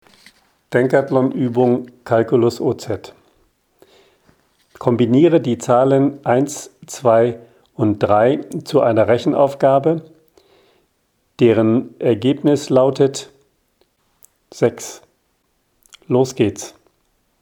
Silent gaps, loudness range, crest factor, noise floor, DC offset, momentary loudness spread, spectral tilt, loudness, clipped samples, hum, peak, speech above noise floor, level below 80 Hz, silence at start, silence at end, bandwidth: none; 7 LU; 18 dB; -65 dBFS; under 0.1%; 11 LU; -6.5 dB/octave; -16 LUFS; under 0.1%; none; 0 dBFS; 50 dB; -62 dBFS; 0.7 s; 0.75 s; 17.5 kHz